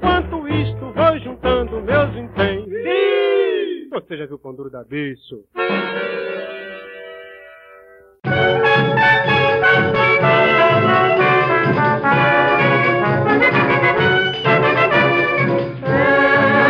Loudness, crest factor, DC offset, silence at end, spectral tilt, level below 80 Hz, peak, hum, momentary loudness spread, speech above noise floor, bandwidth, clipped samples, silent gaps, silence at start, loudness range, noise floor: -15 LUFS; 14 dB; under 0.1%; 0 s; -7.5 dB/octave; -42 dBFS; -2 dBFS; none; 16 LU; 21 dB; 7.2 kHz; under 0.1%; none; 0 s; 12 LU; -45 dBFS